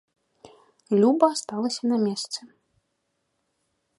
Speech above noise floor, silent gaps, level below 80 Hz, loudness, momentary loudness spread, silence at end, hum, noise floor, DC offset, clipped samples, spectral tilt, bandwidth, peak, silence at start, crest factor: 53 dB; none; -78 dBFS; -24 LUFS; 13 LU; 1.5 s; none; -76 dBFS; under 0.1%; under 0.1%; -5 dB/octave; 11.5 kHz; -6 dBFS; 0.45 s; 22 dB